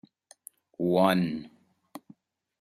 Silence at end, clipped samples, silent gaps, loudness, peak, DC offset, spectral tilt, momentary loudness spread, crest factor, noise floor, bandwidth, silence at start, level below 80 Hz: 0.6 s; under 0.1%; none; -27 LUFS; -8 dBFS; under 0.1%; -6.5 dB/octave; 27 LU; 22 dB; -58 dBFS; 14 kHz; 0.8 s; -70 dBFS